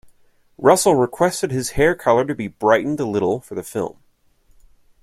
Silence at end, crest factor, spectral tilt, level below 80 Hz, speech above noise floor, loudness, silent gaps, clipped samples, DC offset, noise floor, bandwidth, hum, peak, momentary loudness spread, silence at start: 1.1 s; 18 dB; -5 dB/octave; -46 dBFS; 41 dB; -19 LUFS; none; under 0.1%; under 0.1%; -59 dBFS; 15.5 kHz; none; -2 dBFS; 12 LU; 0.6 s